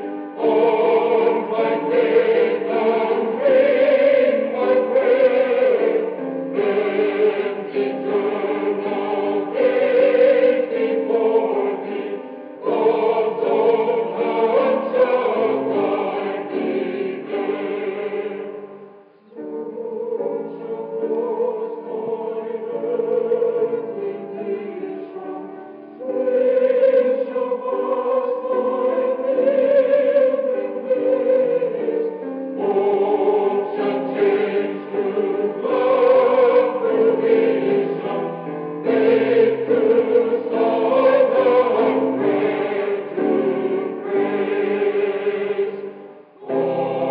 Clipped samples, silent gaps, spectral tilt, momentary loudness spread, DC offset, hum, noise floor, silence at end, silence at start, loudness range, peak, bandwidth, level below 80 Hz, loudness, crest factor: under 0.1%; none; -4 dB/octave; 12 LU; under 0.1%; none; -46 dBFS; 0 s; 0 s; 8 LU; -4 dBFS; 5 kHz; -88 dBFS; -19 LUFS; 14 dB